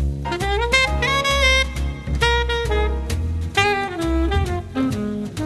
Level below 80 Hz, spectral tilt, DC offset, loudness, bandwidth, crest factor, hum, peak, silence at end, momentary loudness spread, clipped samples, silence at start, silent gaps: -26 dBFS; -4.5 dB/octave; under 0.1%; -20 LUFS; 13 kHz; 20 dB; none; 0 dBFS; 0 s; 8 LU; under 0.1%; 0 s; none